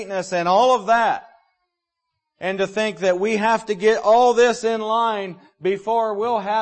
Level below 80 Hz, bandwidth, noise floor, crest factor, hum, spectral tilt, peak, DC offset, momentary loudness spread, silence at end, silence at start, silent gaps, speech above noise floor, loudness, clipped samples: -64 dBFS; 8.8 kHz; -79 dBFS; 14 dB; none; -4 dB/octave; -6 dBFS; under 0.1%; 11 LU; 0 s; 0 s; none; 60 dB; -19 LUFS; under 0.1%